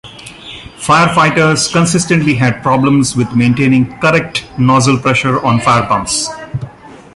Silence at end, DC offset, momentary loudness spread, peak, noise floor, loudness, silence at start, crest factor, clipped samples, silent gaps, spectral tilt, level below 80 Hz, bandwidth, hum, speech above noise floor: 0.2 s; under 0.1%; 15 LU; 0 dBFS; -33 dBFS; -11 LUFS; 0.05 s; 12 dB; under 0.1%; none; -5 dB/octave; -40 dBFS; 11.5 kHz; none; 22 dB